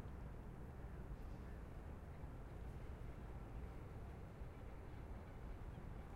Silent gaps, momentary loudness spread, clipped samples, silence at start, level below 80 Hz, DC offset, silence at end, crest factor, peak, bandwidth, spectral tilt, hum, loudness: none; 1 LU; under 0.1%; 0 s; -54 dBFS; under 0.1%; 0 s; 12 dB; -40 dBFS; 16 kHz; -8 dB/octave; none; -55 LUFS